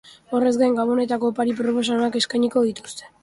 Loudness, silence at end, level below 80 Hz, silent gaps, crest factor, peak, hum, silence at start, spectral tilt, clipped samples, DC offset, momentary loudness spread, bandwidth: -21 LUFS; 0.15 s; -64 dBFS; none; 14 dB; -6 dBFS; none; 0.05 s; -4 dB/octave; under 0.1%; under 0.1%; 6 LU; 11.5 kHz